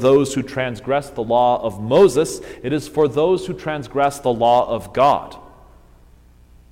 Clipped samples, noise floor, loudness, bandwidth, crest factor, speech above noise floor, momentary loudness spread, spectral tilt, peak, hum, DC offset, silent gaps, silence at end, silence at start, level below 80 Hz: under 0.1%; -48 dBFS; -18 LUFS; 16 kHz; 16 dB; 30 dB; 10 LU; -5.5 dB/octave; -2 dBFS; none; under 0.1%; none; 1.25 s; 0 s; -46 dBFS